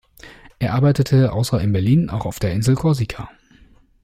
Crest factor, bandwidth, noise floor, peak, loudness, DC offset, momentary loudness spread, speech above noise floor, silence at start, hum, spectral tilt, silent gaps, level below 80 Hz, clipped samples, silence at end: 14 dB; 15.5 kHz; -51 dBFS; -4 dBFS; -19 LUFS; under 0.1%; 10 LU; 33 dB; 0.25 s; none; -7 dB/octave; none; -42 dBFS; under 0.1%; 0.75 s